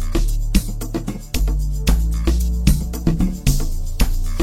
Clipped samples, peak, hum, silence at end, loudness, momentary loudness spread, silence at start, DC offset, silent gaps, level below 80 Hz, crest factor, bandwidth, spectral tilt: under 0.1%; 0 dBFS; none; 0 s; -21 LUFS; 7 LU; 0 s; 0.5%; none; -18 dBFS; 18 dB; 16.5 kHz; -5.5 dB/octave